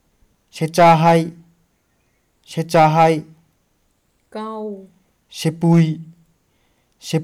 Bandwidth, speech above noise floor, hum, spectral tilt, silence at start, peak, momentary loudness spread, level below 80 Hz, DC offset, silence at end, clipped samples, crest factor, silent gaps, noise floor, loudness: 14 kHz; 49 dB; none; -6.5 dB/octave; 0.55 s; -2 dBFS; 23 LU; -58 dBFS; under 0.1%; 0 s; under 0.1%; 18 dB; none; -64 dBFS; -16 LUFS